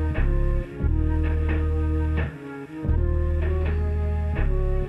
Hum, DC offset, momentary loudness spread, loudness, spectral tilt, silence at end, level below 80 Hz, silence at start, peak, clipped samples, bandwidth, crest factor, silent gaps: none; under 0.1%; 4 LU; -26 LUFS; -9.5 dB/octave; 0 s; -24 dBFS; 0 s; -10 dBFS; under 0.1%; 3.8 kHz; 12 dB; none